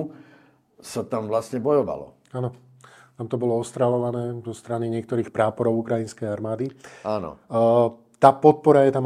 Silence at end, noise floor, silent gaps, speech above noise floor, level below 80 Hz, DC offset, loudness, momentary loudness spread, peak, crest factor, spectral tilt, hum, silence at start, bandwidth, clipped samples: 0 s; -56 dBFS; none; 34 dB; -66 dBFS; under 0.1%; -23 LUFS; 15 LU; 0 dBFS; 22 dB; -7.5 dB/octave; none; 0 s; 13 kHz; under 0.1%